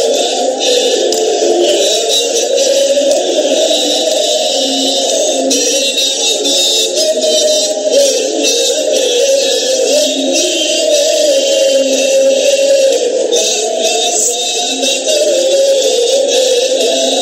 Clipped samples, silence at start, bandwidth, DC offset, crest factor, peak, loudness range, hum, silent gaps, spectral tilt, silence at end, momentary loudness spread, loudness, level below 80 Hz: under 0.1%; 0 s; 16.5 kHz; under 0.1%; 12 dB; 0 dBFS; 1 LU; none; none; 1 dB/octave; 0 s; 2 LU; -10 LUFS; -72 dBFS